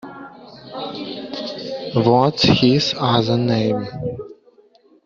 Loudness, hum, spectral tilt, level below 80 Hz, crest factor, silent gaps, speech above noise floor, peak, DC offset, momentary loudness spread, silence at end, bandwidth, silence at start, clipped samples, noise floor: -19 LUFS; none; -5 dB/octave; -50 dBFS; 18 dB; none; 36 dB; -2 dBFS; under 0.1%; 20 LU; 0.75 s; 7.6 kHz; 0.05 s; under 0.1%; -53 dBFS